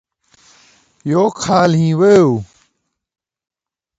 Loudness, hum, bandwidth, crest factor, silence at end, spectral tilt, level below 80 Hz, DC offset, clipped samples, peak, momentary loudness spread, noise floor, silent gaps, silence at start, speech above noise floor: -13 LUFS; none; 9 kHz; 16 dB; 1.55 s; -6.5 dB/octave; -52 dBFS; under 0.1%; under 0.1%; 0 dBFS; 10 LU; -70 dBFS; none; 1.05 s; 58 dB